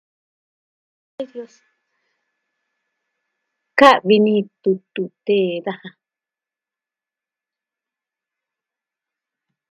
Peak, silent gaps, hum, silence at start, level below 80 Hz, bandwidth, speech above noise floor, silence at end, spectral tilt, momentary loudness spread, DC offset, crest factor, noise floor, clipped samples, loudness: 0 dBFS; none; none; 1.2 s; -70 dBFS; 12 kHz; 72 dB; 3.8 s; -6 dB/octave; 21 LU; under 0.1%; 22 dB; -89 dBFS; under 0.1%; -17 LUFS